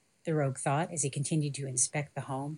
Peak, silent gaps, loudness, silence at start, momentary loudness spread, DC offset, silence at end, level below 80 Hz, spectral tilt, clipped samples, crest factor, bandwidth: -14 dBFS; none; -32 LUFS; 0.25 s; 7 LU; under 0.1%; 0 s; -78 dBFS; -4.5 dB/octave; under 0.1%; 18 dB; 11.5 kHz